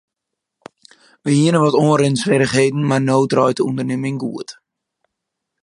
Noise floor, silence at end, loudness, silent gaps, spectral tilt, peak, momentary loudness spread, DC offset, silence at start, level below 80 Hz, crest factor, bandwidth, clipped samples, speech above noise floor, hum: -80 dBFS; 1.1 s; -16 LUFS; none; -6 dB/octave; 0 dBFS; 12 LU; under 0.1%; 1.25 s; -58 dBFS; 18 dB; 11 kHz; under 0.1%; 65 dB; none